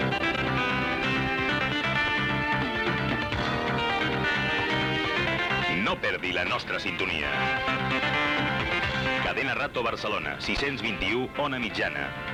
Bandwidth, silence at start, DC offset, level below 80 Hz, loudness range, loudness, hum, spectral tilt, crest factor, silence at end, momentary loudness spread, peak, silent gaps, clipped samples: 15.5 kHz; 0 s; under 0.1%; -46 dBFS; 1 LU; -26 LUFS; none; -5 dB/octave; 14 dB; 0 s; 3 LU; -14 dBFS; none; under 0.1%